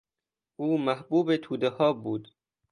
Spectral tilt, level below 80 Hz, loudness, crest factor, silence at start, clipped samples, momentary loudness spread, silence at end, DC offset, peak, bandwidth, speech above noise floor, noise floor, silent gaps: -7.5 dB/octave; -72 dBFS; -28 LUFS; 18 dB; 0.6 s; under 0.1%; 9 LU; 0.5 s; under 0.1%; -12 dBFS; 10 kHz; 63 dB; -90 dBFS; none